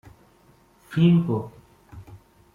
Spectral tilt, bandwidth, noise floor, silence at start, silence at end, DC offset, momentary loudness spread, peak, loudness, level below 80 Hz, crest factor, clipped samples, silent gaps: -9 dB/octave; 4.5 kHz; -57 dBFS; 0.9 s; 0.4 s; under 0.1%; 27 LU; -8 dBFS; -22 LUFS; -58 dBFS; 18 dB; under 0.1%; none